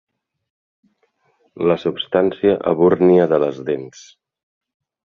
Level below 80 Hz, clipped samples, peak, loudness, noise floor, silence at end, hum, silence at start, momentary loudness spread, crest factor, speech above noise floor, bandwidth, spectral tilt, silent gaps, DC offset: -58 dBFS; under 0.1%; -2 dBFS; -17 LUFS; -64 dBFS; 1.25 s; none; 1.55 s; 12 LU; 18 dB; 48 dB; 7.2 kHz; -7.5 dB/octave; none; under 0.1%